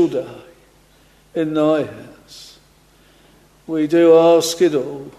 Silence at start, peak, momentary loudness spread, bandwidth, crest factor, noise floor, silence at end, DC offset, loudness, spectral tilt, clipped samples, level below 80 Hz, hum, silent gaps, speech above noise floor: 0 s; -2 dBFS; 28 LU; 13.5 kHz; 16 dB; -52 dBFS; 0.1 s; under 0.1%; -16 LUFS; -5 dB/octave; under 0.1%; -58 dBFS; none; none; 36 dB